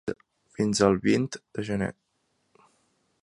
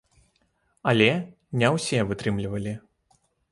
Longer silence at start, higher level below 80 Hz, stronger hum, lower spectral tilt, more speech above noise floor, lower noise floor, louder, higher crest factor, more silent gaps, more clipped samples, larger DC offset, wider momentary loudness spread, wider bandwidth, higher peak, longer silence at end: second, 0.05 s vs 0.85 s; about the same, -56 dBFS vs -54 dBFS; neither; about the same, -5.5 dB/octave vs -5.5 dB/octave; about the same, 48 dB vs 45 dB; first, -74 dBFS vs -69 dBFS; about the same, -27 LUFS vs -25 LUFS; about the same, 22 dB vs 22 dB; neither; neither; neither; about the same, 13 LU vs 12 LU; about the same, 11.5 kHz vs 11.5 kHz; about the same, -6 dBFS vs -6 dBFS; first, 1.35 s vs 0.7 s